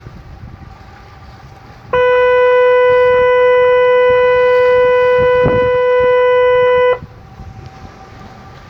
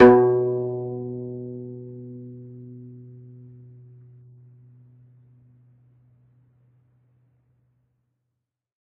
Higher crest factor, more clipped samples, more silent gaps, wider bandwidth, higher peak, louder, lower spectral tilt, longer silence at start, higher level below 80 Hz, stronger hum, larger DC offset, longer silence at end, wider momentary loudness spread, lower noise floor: second, 12 dB vs 26 dB; neither; neither; first, 5.8 kHz vs 5 kHz; about the same, 0 dBFS vs 0 dBFS; first, -11 LUFS vs -23 LUFS; about the same, -6.5 dB/octave vs -7 dB/octave; about the same, 0.05 s vs 0 s; first, -38 dBFS vs -60 dBFS; neither; neither; second, 0.2 s vs 6 s; second, 3 LU vs 27 LU; second, -36 dBFS vs -82 dBFS